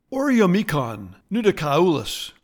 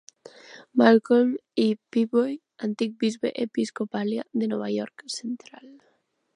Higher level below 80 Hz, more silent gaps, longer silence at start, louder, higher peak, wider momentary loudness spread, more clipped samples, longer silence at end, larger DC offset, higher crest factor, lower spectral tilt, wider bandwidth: first, -50 dBFS vs -80 dBFS; neither; second, 0.1 s vs 0.5 s; first, -21 LUFS vs -25 LUFS; about the same, -4 dBFS vs -4 dBFS; second, 11 LU vs 14 LU; neither; second, 0.15 s vs 0.65 s; neither; about the same, 16 dB vs 20 dB; about the same, -6 dB/octave vs -5.5 dB/octave; first, 19 kHz vs 11 kHz